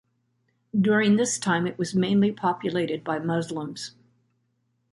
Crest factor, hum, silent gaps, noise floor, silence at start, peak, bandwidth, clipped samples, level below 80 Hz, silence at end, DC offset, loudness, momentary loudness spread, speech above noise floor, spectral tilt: 16 dB; none; none; -72 dBFS; 0.75 s; -10 dBFS; 11.5 kHz; under 0.1%; -66 dBFS; 1 s; under 0.1%; -25 LUFS; 12 LU; 48 dB; -5 dB/octave